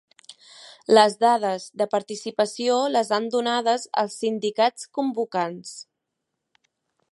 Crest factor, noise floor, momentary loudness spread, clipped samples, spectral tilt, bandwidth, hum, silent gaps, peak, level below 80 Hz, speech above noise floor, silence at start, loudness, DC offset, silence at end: 22 dB; -81 dBFS; 12 LU; under 0.1%; -3.5 dB/octave; 11.5 kHz; none; none; -2 dBFS; -80 dBFS; 58 dB; 0.3 s; -23 LUFS; under 0.1%; 1.3 s